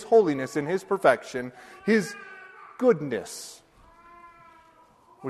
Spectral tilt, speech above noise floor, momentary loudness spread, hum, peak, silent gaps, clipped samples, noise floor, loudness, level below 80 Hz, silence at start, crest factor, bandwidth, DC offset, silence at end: -5.5 dB/octave; 32 dB; 20 LU; none; -6 dBFS; none; under 0.1%; -57 dBFS; -25 LUFS; -68 dBFS; 0 s; 22 dB; 13 kHz; under 0.1%; 0 s